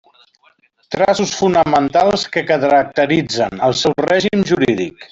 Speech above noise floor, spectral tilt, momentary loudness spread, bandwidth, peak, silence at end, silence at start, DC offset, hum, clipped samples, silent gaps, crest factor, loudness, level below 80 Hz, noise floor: 41 dB; -4.5 dB/octave; 4 LU; 8 kHz; -2 dBFS; 0.05 s; 0.9 s; under 0.1%; none; under 0.1%; none; 14 dB; -15 LUFS; -50 dBFS; -55 dBFS